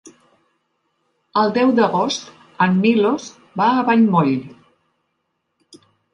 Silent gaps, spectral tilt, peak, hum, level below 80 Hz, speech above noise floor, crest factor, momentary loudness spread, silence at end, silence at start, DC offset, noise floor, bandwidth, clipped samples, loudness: none; -6 dB/octave; -2 dBFS; none; -66 dBFS; 56 dB; 18 dB; 10 LU; 0.4 s; 1.35 s; under 0.1%; -72 dBFS; 9 kHz; under 0.1%; -17 LUFS